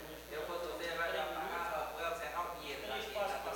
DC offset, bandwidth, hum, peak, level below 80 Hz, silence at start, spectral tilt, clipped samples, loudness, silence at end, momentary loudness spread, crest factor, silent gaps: under 0.1%; 17 kHz; none; -26 dBFS; -60 dBFS; 0 s; -3 dB/octave; under 0.1%; -40 LUFS; 0 s; 5 LU; 14 dB; none